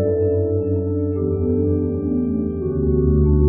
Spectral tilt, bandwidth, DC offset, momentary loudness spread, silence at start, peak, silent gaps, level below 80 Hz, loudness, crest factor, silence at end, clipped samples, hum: -12.5 dB/octave; 2.5 kHz; under 0.1%; 5 LU; 0 s; -4 dBFS; none; -26 dBFS; -20 LUFS; 14 dB; 0 s; under 0.1%; none